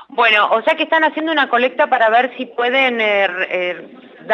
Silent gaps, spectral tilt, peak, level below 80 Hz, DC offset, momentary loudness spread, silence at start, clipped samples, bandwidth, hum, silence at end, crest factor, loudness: none; -4 dB/octave; -2 dBFS; -76 dBFS; under 0.1%; 8 LU; 0 s; under 0.1%; 7.6 kHz; none; 0 s; 14 dB; -15 LUFS